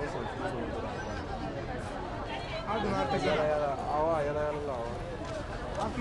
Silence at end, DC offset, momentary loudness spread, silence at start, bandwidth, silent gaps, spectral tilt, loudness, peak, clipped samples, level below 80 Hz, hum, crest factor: 0 s; under 0.1%; 9 LU; 0 s; 11.5 kHz; none; -6 dB/octave; -33 LUFS; -18 dBFS; under 0.1%; -46 dBFS; none; 16 dB